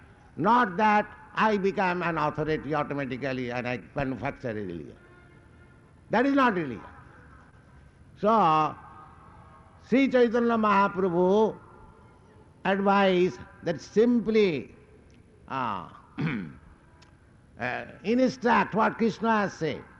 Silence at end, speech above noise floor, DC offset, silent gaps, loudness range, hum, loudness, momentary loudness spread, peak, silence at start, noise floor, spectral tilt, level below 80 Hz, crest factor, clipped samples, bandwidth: 0.15 s; 30 dB; under 0.1%; none; 7 LU; none; -26 LUFS; 13 LU; -12 dBFS; 0.35 s; -56 dBFS; -7 dB/octave; -58 dBFS; 16 dB; under 0.1%; 10 kHz